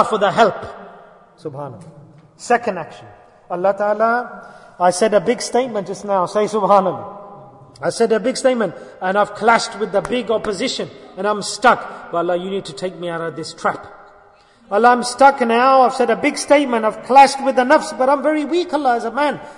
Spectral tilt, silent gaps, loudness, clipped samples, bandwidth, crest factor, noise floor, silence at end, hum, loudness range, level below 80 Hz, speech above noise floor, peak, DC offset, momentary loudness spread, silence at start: -4 dB/octave; none; -17 LUFS; under 0.1%; 11 kHz; 18 dB; -49 dBFS; 0.05 s; none; 8 LU; -56 dBFS; 32 dB; 0 dBFS; under 0.1%; 17 LU; 0 s